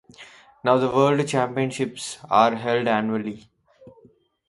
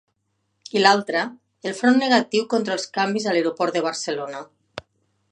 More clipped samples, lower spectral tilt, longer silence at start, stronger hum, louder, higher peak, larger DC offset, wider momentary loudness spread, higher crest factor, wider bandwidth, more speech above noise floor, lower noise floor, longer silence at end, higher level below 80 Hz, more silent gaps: neither; first, -5.5 dB/octave vs -3.5 dB/octave; second, 0.2 s vs 0.75 s; neither; about the same, -22 LUFS vs -21 LUFS; second, -4 dBFS vs 0 dBFS; neither; second, 10 LU vs 19 LU; about the same, 20 dB vs 22 dB; about the same, 11.5 kHz vs 10.5 kHz; second, 35 dB vs 52 dB; second, -56 dBFS vs -72 dBFS; first, 1.1 s vs 0.5 s; first, -64 dBFS vs -70 dBFS; neither